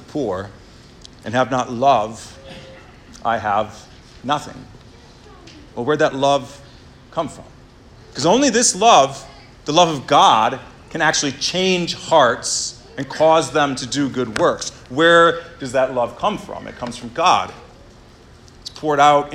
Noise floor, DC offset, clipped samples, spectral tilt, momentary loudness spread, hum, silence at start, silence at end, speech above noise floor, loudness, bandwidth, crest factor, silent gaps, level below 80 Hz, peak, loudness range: -45 dBFS; under 0.1%; under 0.1%; -3 dB/octave; 19 LU; none; 0 s; 0 s; 27 dB; -17 LUFS; 15.5 kHz; 18 dB; none; -50 dBFS; 0 dBFS; 8 LU